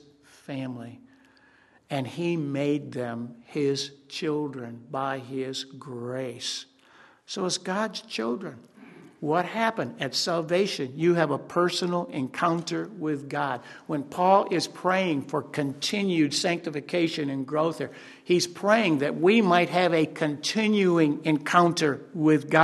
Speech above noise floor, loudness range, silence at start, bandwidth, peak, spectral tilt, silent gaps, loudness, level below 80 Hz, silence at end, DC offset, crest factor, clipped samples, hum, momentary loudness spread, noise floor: 33 dB; 9 LU; 0.5 s; 12.5 kHz; -2 dBFS; -5 dB/octave; none; -26 LUFS; -74 dBFS; 0 s; under 0.1%; 24 dB; under 0.1%; none; 13 LU; -59 dBFS